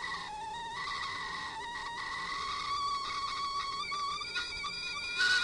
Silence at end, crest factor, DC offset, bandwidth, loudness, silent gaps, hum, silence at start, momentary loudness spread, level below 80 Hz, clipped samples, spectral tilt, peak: 0 s; 18 dB; under 0.1%; 11.5 kHz; -35 LUFS; none; none; 0 s; 5 LU; -60 dBFS; under 0.1%; -0.5 dB/octave; -18 dBFS